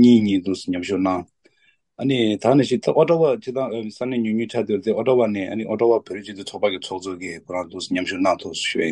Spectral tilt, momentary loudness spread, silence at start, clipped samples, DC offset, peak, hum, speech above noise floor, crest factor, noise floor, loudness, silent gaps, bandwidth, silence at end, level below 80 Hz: -6 dB/octave; 12 LU; 0 s; under 0.1%; under 0.1%; -2 dBFS; none; 42 dB; 18 dB; -63 dBFS; -21 LUFS; none; 10.5 kHz; 0 s; -62 dBFS